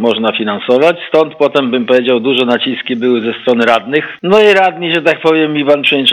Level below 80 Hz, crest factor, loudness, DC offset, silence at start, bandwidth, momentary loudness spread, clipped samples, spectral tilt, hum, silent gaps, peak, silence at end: -58 dBFS; 10 dB; -11 LUFS; under 0.1%; 0 s; 10.5 kHz; 6 LU; 0.4%; -5.5 dB/octave; none; none; 0 dBFS; 0 s